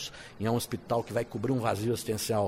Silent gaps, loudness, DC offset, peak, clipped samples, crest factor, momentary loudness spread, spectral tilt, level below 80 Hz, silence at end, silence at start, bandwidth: none; -31 LUFS; under 0.1%; -14 dBFS; under 0.1%; 16 dB; 4 LU; -5.5 dB/octave; -60 dBFS; 0 s; 0 s; 16 kHz